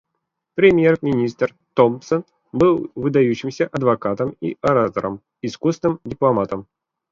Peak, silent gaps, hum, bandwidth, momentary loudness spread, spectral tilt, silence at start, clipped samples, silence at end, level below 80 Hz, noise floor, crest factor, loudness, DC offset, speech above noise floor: -2 dBFS; none; none; 7.4 kHz; 10 LU; -7.5 dB/octave; 0.55 s; under 0.1%; 0.5 s; -52 dBFS; -77 dBFS; 18 dB; -19 LUFS; under 0.1%; 59 dB